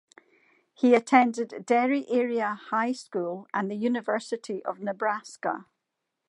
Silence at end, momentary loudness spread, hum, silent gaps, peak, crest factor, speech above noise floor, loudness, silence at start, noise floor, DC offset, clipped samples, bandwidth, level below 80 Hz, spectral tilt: 0.65 s; 11 LU; none; none; -4 dBFS; 24 dB; 57 dB; -27 LUFS; 0.8 s; -83 dBFS; under 0.1%; under 0.1%; 11 kHz; -84 dBFS; -5 dB/octave